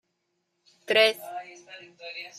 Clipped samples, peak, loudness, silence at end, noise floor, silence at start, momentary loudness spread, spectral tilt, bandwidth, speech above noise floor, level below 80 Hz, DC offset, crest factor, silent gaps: under 0.1%; -8 dBFS; -23 LUFS; 0.1 s; -78 dBFS; 0.9 s; 24 LU; -1.5 dB/octave; 15.5 kHz; 51 dB; -86 dBFS; under 0.1%; 22 dB; none